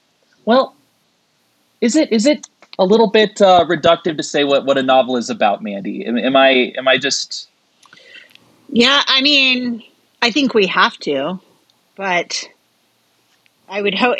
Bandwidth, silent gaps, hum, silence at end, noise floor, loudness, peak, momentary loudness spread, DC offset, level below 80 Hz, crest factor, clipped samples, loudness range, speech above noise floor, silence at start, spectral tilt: 9.8 kHz; none; none; 0 s; -61 dBFS; -15 LUFS; 0 dBFS; 14 LU; under 0.1%; -62 dBFS; 16 dB; under 0.1%; 4 LU; 46 dB; 0.45 s; -3.5 dB/octave